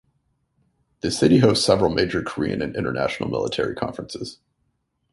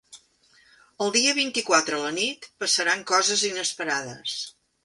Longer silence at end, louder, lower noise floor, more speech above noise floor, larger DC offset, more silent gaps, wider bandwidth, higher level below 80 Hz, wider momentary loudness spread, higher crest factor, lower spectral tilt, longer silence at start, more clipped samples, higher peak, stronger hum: first, 0.8 s vs 0.35 s; about the same, -21 LUFS vs -23 LUFS; first, -72 dBFS vs -60 dBFS; first, 50 dB vs 35 dB; neither; neither; about the same, 11.5 kHz vs 11.5 kHz; first, -48 dBFS vs -74 dBFS; first, 15 LU vs 11 LU; about the same, 20 dB vs 24 dB; first, -5.5 dB/octave vs -0.5 dB/octave; first, 1.05 s vs 0.1 s; neither; about the same, -2 dBFS vs -2 dBFS; neither